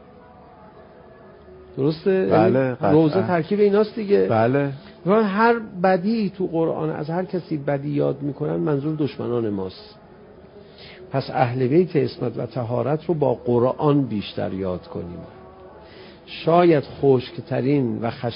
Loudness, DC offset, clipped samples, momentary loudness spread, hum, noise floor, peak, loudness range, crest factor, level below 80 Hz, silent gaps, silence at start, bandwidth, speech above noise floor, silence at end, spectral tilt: -21 LUFS; under 0.1%; under 0.1%; 11 LU; none; -46 dBFS; -2 dBFS; 6 LU; 18 dB; -54 dBFS; none; 0.65 s; 5.4 kHz; 25 dB; 0 s; -12 dB/octave